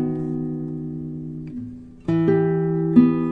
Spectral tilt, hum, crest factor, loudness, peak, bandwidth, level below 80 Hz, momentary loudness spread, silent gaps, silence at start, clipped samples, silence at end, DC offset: -11 dB/octave; none; 20 dB; -21 LUFS; -2 dBFS; 4.5 kHz; -50 dBFS; 17 LU; none; 0 s; under 0.1%; 0 s; under 0.1%